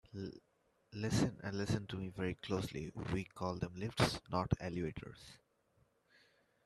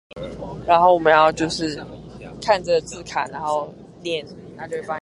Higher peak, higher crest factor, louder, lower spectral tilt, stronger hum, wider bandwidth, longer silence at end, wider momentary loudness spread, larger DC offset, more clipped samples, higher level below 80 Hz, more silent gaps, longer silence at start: second, -16 dBFS vs -2 dBFS; about the same, 24 dB vs 20 dB; second, -40 LUFS vs -20 LUFS; about the same, -5.5 dB/octave vs -4.5 dB/octave; neither; first, 13.5 kHz vs 11.5 kHz; first, 1.3 s vs 0.05 s; second, 15 LU vs 21 LU; neither; neither; second, -60 dBFS vs -50 dBFS; neither; about the same, 0.15 s vs 0.15 s